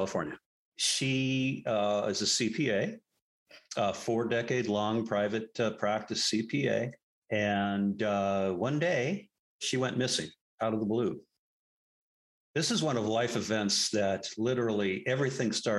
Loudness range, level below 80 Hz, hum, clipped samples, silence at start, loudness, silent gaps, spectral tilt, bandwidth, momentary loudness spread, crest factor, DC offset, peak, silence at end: 3 LU; -72 dBFS; none; under 0.1%; 0 s; -31 LUFS; 0.46-0.72 s, 3.22-3.46 s, 7.03-7.22 s, 9.39-9.59 s, 10.41-10.58 s, 11.39-12.54 s; -4 dB/octave; 12.5 kHz; 7 LU; 16 dB; under 0.1%; -14 dBFS; 0 s